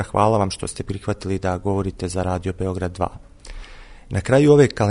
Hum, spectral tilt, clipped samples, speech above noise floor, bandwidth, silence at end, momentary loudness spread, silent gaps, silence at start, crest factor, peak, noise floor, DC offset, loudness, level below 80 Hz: none; -6.5 dB/octave; under 0.1%; 20 dB; 11 kHz; 0 s; 14 LU; none; 0 s; 20 dB; -2 dBFS; -39 dBFS; under 0.1%; -21 LUFS; -40 dBFS